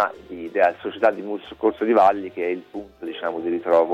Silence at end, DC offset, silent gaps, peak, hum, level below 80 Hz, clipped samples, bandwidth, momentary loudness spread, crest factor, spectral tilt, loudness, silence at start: 0 s; under 0.1%; none; -6 dBFS; none; -60 dBFS; under 0.1%; 8 kHz; 16 LU; 16 dB; -6.5 dB/octave; -22 LUFS; 0 s